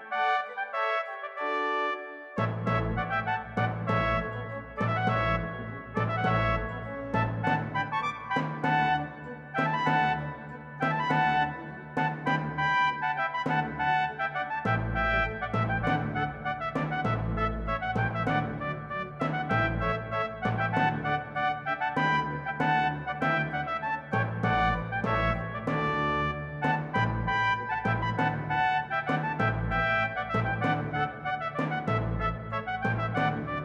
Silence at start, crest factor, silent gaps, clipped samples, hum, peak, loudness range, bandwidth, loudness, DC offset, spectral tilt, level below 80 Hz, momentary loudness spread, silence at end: 0 s; 16 dB; none; under 0.1%; none; -12 dBFS; 2 LU; 7.8 kHz; -29 LUFS; under 0.1%; -7 dB/octave; -46 dBFS; 6 LU; 0 s